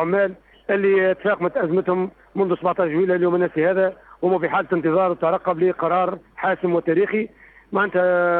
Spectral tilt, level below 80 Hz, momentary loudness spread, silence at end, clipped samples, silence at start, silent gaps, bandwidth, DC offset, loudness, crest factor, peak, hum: -10 dB/octave; -60 dBFS; 6 LU; 0 s; under 0.1%; 0 s; none; 4.2 kHz; under 0.1%; -21 LUFS; 14 dB; -6 dBFS; none